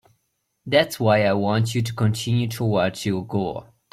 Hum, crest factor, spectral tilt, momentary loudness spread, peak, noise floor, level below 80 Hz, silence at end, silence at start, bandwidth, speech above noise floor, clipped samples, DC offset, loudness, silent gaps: none; 18 dB; -6 dB/octave; 8 LU; -6 dBFS; -73 dBFS; -56 dBFS; 0.3 s; 0.65 s; 15.5 kHz; 52 dB; under 0.1%; under 0.1%; -22 LUFS; none